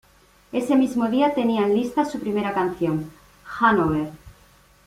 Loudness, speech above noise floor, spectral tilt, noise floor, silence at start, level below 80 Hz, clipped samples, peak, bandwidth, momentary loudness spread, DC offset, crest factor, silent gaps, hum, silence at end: -22 LUFS; 34 dB; -6.5 dB/octave; -55 dBFS; 0.55 s; -52 dBFS; under 0.1%; -4 dBFS; 15.5 kHz; 10 LU; under 0.1%; 18 dB; none; none; 0.55 s